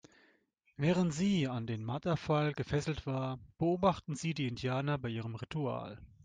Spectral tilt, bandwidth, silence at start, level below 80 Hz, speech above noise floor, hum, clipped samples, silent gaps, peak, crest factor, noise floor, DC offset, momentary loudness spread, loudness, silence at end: -6.5 dB/octave; 9.6 kHz; 0.8 s; -60 dBFS; 38 dB; none; under 0.1%; none; -16 dBFS; 20 dB; -72 dBFS; under 0.1%; 8 LU; -35 LUFS; 0.2 s